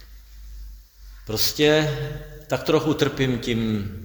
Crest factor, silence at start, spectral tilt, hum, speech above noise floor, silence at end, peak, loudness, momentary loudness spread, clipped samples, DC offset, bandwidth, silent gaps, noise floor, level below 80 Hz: 20 dB; 0 s; -5 dB/octave; none; 22 dB; 0 s; -4 dBFS; -22 LUFS; 24 LU; under 0.1%; under 0.1%; over 20 kHz; none; -44 dBFS; -42 dBFS